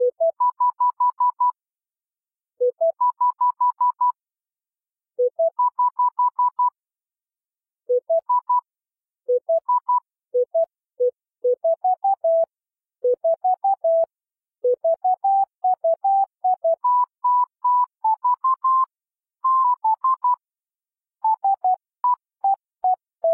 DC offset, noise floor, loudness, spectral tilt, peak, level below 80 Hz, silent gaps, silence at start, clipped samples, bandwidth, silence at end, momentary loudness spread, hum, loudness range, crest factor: under 0.1%; under -90 dBFS; -21 LUFS; -8 dB/octave; -14 dBFS; -86 dBFS; none; 0 s; under 0.1%; 1.6 kHz; 0 s; 5 LU; none; 3 LU; 8 dB